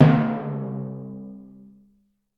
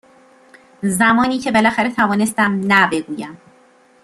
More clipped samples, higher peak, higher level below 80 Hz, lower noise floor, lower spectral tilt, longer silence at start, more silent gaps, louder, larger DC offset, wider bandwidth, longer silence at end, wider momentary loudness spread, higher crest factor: neither; about the same, -2 dBFS vs -2 dBFS; about the same, -58 dBFS vs -54 dBFS; first, -64 dBFS vs -51 dBFS; first, -10 dB/octave vs -4.5 dB/octave; second, 0 s vs 0.8 s; neither; second, -25 LUFS vs -16 LUFS; neither; second, 5.2 kHz vs 13.5 kHz; first, 0.95 s vs 0.7 s; first, 23 LU vs 12 LU; first, 22 dB vs 16 dB